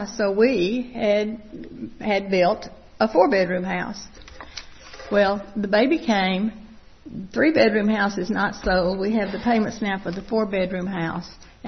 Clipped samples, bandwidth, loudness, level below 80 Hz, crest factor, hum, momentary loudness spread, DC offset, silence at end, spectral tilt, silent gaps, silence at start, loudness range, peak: under 0.1%; 6.4 kHz; -22 LUFS; -46 dBFS; 20 dB; none; 19 LU; under 0.1%; 0 s; -6 dB/octave; none; 0 s; 2 LU; -2 dBFS